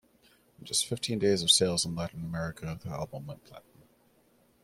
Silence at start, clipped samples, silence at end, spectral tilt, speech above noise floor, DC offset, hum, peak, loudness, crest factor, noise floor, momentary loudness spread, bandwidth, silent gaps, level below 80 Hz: 0.6 s; under 0.1%; 1.05 s; -3 dB/octave; 35 dB; under 0.1%; none; -8 dBFS; -29 LUFS; 24 dB; -66 dBFS; 20 LU; 16 kHz; none; -60 dBFS